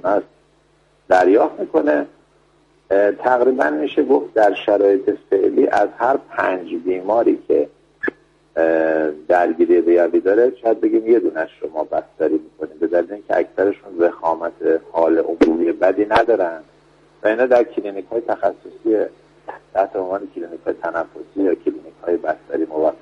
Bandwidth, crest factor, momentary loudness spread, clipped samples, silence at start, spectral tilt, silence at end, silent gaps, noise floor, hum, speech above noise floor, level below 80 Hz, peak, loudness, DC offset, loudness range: 7.6 kHz; 18 dB; 11 LU; under 0.1%; 0.05 s; -6.5 dB/octave; 0.05 s; none; -57 dBFS; none; 40 dB; -56 dBFS; 0 dBFS; -18 LUFS; under 0.1%; 6 LU